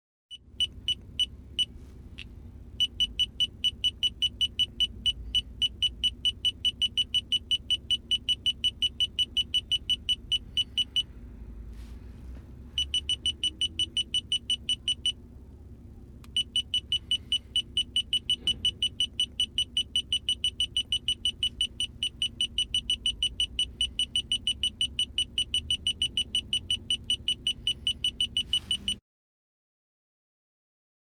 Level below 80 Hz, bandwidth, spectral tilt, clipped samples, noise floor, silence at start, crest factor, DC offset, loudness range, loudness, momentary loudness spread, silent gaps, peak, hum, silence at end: -48 dBFS; 15.5 kHz; -0.5 dB/octave; under 0.1%; -47 dBFS; 0.3 s; 16 dB; under 0.1%; 4 LU; -27 LUFS; 5 LU; none; -16 dBFS; none; 2.1 s